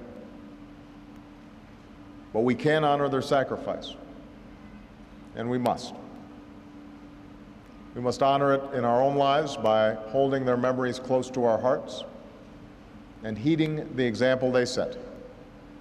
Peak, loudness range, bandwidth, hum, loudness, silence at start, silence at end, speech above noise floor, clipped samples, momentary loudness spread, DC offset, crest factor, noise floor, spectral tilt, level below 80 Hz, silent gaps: -12 dBFS; 10 LU; 13 kHz; none; -26 LUFS; 0 s; 0 s; 23 dB; under 0.1%; 24 LU; under 0.1%; 16 dB; -48 dBFS; -6 dB/octave; -56 dBFS; none